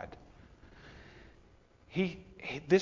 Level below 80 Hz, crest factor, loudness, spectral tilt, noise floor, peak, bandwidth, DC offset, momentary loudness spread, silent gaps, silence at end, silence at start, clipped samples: -60 dBFS; 24 dB; -36 LUFS; -6.5 dB/octave; -62 dBFS; -14 dBFS; 7.4 kHz; under 0.1%; 23 LU; none; 0 s; 0 s; under 0.1%